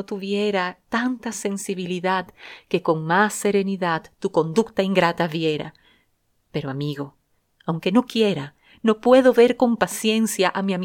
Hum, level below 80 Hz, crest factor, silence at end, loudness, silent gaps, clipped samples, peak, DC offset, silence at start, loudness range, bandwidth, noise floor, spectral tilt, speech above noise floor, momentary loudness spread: none; -62 dBFS; 18 dB; 0 s; -21 LUFS; none; under 0.1%; -4 dBFS; under 0.1%; 0 s; 6 LU; 18.5 kHz; -67 dBFS; -5 dB/octave; 46 dB; 13 LU